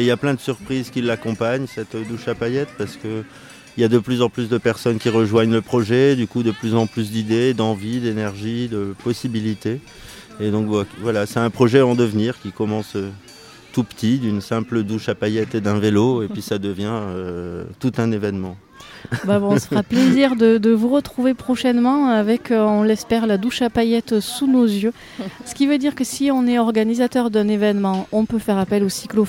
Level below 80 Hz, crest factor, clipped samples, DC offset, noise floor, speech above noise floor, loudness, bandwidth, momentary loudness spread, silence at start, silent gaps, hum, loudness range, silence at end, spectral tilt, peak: -54 dBFS; 18 dB; under 0.1%; under 0.1%; -42 dBFS; 23 dB; -19 LUFS; 16.5 kHz; 12 LU; 0 s; none; none; 6 LU; 0 s; -6.5 dB/octave; 0 dBFS